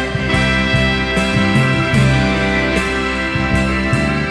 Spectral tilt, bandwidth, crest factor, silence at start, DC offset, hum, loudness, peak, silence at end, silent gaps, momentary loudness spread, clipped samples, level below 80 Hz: -5.5 dB/octave; 11 kHz; 14 dB; 0 s; under 0.1%; none; -15 LUFS; 0 dBFS; 0 s; none; 3 LU; under 0.1%; -26 dBFS